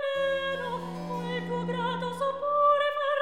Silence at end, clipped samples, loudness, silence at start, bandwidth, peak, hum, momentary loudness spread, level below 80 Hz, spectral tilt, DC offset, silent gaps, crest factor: 0 s; under 0.1%; -28 LUFS; 0 s; 13 kHz; -14 dBFS; none; 11 LU; -64 dBFS; -6 dB/octave; 0.2%; none; 16 dB